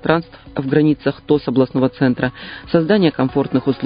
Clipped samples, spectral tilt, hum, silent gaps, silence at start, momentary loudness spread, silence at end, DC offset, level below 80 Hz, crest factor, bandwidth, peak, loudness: under 0.1%; -11.5 dB/octave; none; none; 0.05 s; 7 LU; 0 s; under 0.1%; -46 dBFS; 16 dB; 5.2 kHz; 0 dBFS; -17 LUFS